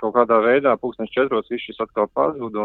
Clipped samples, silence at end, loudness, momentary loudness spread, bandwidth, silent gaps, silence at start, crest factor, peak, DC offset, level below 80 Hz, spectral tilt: under 0.1%; 0 s; -20 LUFS; 10 LU; 4.3 kHz; none; 0 s; 18 dB; -2 dBFS; under 0.1%; -60 dBFS; -8.5 dB/octave